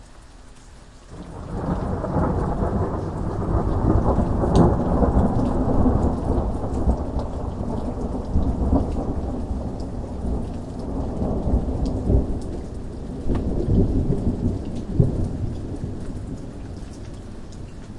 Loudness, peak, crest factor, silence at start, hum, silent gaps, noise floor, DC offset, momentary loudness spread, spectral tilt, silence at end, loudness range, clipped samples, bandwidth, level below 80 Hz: -24 LUFS; -4 dBFS; 20 dB; 0 s; none; none; -43 dBFS; under 0.1%; 14 LU; -9 dB/octave; 0 s; 6 LU; under 0.1%; 11 kHz; -28 dBFS